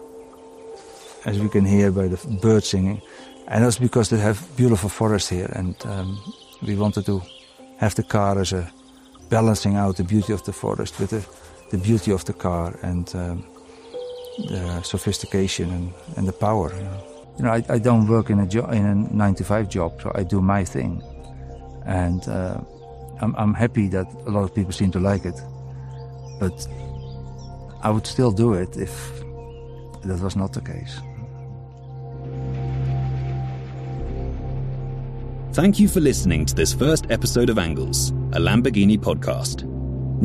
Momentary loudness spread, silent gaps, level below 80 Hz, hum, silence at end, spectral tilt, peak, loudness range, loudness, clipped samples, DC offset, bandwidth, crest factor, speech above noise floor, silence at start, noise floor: 18 LU; none; -38 dBFS; none; 0 s; -6 dB/octave; -4 dBFS; 8 LU; -22 LUFS; under 0.1%; under 0.1%; 15 kHz; 18 dB; 26 dB; 0 s; -46 dBFS